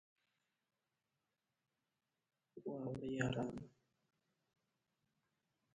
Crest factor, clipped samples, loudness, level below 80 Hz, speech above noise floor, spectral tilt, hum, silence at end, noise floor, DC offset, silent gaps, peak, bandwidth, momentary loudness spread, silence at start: 28 dB; under 0.1%; -45 LUFS; -74 dBFS; over 47 dB; -6.5 dB/octave; none; 2.05 s; under -90 dBFS; under 0.1%; none; -22 dBFS; 9 kHz; 18 LU; 2.55 s